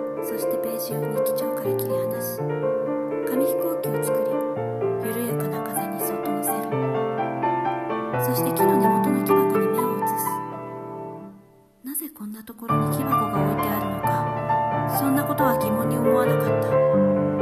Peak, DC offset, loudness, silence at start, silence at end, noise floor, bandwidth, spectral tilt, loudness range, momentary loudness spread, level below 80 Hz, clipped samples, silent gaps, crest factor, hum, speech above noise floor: -6 dBFS; under 0.1%; -23 LUFS; 0 s; 0 s; -52 dBFS; 14.5 kHz; -6.5 dB/octave; 5 LU; 10 LU; -56 dBFS; under 0.1%; none; 18 dB; none; 28 dB